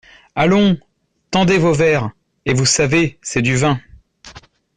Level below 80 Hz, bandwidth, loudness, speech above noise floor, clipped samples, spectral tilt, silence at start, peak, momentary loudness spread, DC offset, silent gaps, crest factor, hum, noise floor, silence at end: -46 dBFS; 10 kHz; -16 LUFS; 27 dB; under 0.1%; -4.5 dB/octave; 0.35 s; -2 dBFS; 11 LU; under 0.1%; none; 14 dB; none; -42 dBFS; 0.35 s